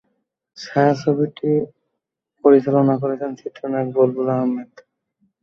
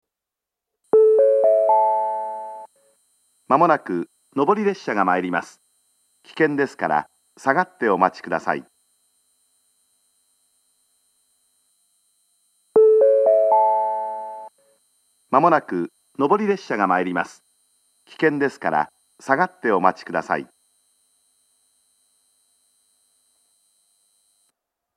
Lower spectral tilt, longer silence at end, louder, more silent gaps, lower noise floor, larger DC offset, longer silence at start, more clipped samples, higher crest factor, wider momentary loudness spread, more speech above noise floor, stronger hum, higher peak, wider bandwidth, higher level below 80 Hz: first, -8.5 dB/octave vs -6.5 dB/octave; second, 0.8 s vs 4.5 s; about the same, -19 LUFS vs -20 LUFS; neither; second, -79 dBFS vs -86 dBFS; neither; second, 0.55 s vs 0.95 s; neither; about the same, 18 dB vs 22 dB; about the same, 14 LU vs 15 LU; second, 61 dB vs 66 dB; second, none vs 50 Hz at -55 dBFS; about the same, -2 dBFS vs 0 dBFS; second, 7 kHz vs 10.5 kHz; first, -64 dBFS vs -76 dBFS